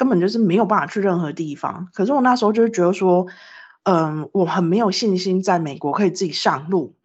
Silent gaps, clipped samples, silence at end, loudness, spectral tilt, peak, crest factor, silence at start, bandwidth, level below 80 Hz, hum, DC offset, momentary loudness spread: none; under 0.1%; 0.15 s; -19 LUFS; -6 dB/octave; -2 dBFS; 16 dB; 0 s; 8.2 kHz; -70 dBFS; none; under 0.1%; 8 LU